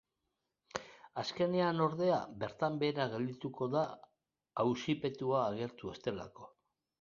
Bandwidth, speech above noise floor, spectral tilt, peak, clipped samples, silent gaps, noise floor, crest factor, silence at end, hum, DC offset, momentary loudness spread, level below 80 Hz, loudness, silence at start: 7.4 kHz; 51 dB; -5 dB/octave; -16 dBFS; under 0.1%; none; -86 dBFS; 22 dB; 0.55 s; none; under 0.1%; 13 LU; -72 dBFS; -36 LUFS; 0.75 s